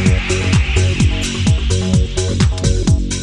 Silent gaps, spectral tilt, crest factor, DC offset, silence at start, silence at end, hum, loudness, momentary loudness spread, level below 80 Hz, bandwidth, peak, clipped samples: none; -5 dB/octave; 14 dB; under 0.1%; 0 s; 0 s; none; -15 LUFS; 2 LU; -20 dBFS; 12 kHz; 0 dBFS; under 0.1%